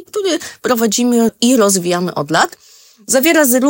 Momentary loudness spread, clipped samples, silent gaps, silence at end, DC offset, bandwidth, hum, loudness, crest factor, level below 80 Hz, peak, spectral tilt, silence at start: 8 LU; under 0.1%; none; 0 s; under 0.1%; 18.5 kHz; none; -14 LUFS; 14 dB; -60 dBFS; 0 dBFS; -3 dB/octave; 0 s